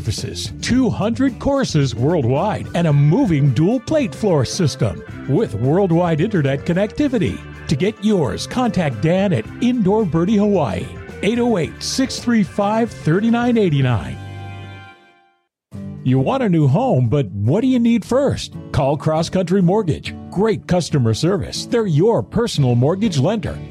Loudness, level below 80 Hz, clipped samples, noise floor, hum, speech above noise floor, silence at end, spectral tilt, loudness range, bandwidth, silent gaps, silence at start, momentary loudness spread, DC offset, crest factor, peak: -18 LUFS; -42 dBFS; under 0.1%; -61 dBFS; none; 44 dB; 0 s; -6.5 dB/octave; 3 LU; 13 kHz; none; 0 s; 8 LU; under 0.1%; 10 dB; -6 dBFS